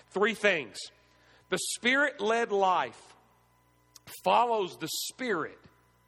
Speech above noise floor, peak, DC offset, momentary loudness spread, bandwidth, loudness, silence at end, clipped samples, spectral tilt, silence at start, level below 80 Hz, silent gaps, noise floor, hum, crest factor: 37 dB; -10 dBFS; under 0.1%; 14 LU; 18 kHz; -28 LUFS; 0.55 s; under 0.1%; -2.5 dB/octave; 0.15 s; -74 dBFS; none; -66 dBFS; 60 Hz at -70 dBFS; 20 dB